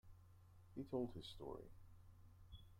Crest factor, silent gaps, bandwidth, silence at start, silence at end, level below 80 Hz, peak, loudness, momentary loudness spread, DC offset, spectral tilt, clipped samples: 20 dB; none; 16 kHz; 0.05 s; 0 s; -66 dBFS; -32 dBFS; -51 LUFS; 21 LU; under 0.1%; -7.5 dB/octave; under 0.1%